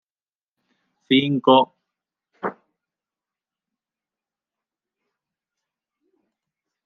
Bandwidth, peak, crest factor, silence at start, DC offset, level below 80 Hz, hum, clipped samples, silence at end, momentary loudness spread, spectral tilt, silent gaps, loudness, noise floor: 4.2 kHz; -2 dBFS; 24 dB; 1.1 s; under 0.1%; -76 dBFS; none; under 0.1%; 4.35 s; 16 LU; -8 dB/octave; none; -18 LUFS; under -90 dBFS